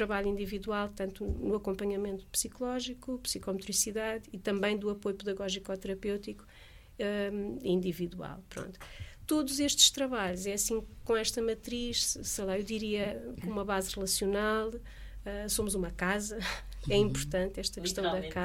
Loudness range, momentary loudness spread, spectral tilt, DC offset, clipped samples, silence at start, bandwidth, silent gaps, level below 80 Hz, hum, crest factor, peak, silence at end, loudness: 6 LU; 10 LU; -3 dB/octave; under 0.1%; under 0.1%; 0 s; 17 kHz; none; -48 dBFS; none; 26 dB; -8 dBFS; 0 s; -33 LUFS